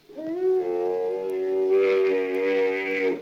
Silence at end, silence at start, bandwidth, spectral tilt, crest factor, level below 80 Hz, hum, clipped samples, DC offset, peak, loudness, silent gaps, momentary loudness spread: 0 s; 0.1 s; 6.8 kHz; -5.5 dB/octave; 12 dB; -72 dBFS; none; under 0.1%; under 0.1%; -12 dBFS; -24 LUFS; none; 6 LU